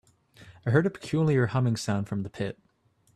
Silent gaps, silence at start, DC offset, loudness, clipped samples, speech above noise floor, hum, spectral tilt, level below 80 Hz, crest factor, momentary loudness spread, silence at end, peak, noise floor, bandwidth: none; 0.4 s; under 0.1%; -28 LUFS; under 0.1%; 28 dB; none; -7 dB/octave; -62 dBFS; 18 dB; 11 LU; 0.65 s; -10 dBFS; -54 dBFS; 13 kHz